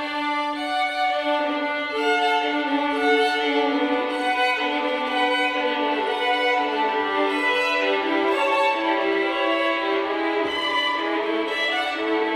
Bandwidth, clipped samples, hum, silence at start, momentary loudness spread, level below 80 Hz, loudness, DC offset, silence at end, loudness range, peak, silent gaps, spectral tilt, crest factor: 15.5 kHz; under 0.1%; none; 0 s; 4 LU; -64 dBFS; -22 LUFS; under 0.1%; 0 s; 1 LU; -8 dBFS; none; -2.5 dB/octave; 14 dB